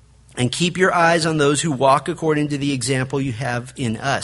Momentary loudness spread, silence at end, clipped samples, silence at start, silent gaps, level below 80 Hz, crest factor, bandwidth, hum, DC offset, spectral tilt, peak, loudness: 9 LU; 0 s; under 0.1%; 0.35 s; none; -50 dBFS; 18 dB; 11.5 kHz; none; under 0.1%; -4.5 dB/octave; -2 dBFS; -19 LUFS